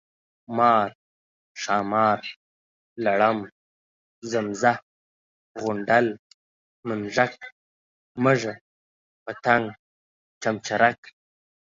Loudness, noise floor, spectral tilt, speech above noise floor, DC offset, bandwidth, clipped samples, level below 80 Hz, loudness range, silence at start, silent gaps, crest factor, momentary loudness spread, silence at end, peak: -24 LUFS; under -90 dBFS; -5 dB/octave; over 67 dB; under 0.1%; 7.6 kHz; under 0.1%; -68 dBFS; 2 LU; 0.5 s; 0.95-1.55 s, 2.36-2.96 s, 3.52-4.22 s, 4.82-5.55 s, 6.19-6.83 s, 7.52-8.15 s, 8.61-9.26 s, 9.79-10.41 s; 22 dB; 21 LU; 0.8 s; -4 dBFS